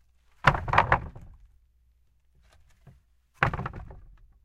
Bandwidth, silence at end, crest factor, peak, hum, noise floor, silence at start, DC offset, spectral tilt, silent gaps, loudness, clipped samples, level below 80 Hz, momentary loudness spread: 14 kHz; 0.35 s; 28 dB; -4 dBFS; none; -64 dBFS; 0.45 s; under 0.1%; -6 dB/octave; none; -26 LUFS; under 0.1%; -44 dBFS; 22 LU